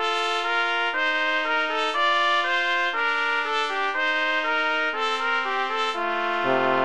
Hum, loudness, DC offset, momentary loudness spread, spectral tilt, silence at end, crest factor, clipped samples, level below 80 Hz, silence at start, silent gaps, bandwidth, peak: none; -23 LUFS; 0.7%; 3 LU; -2 dB/octave; 0 s; 16 dB; under 0.1%; -66 dBFS; 0 s; none; 11.5 kHz; -8 dBFS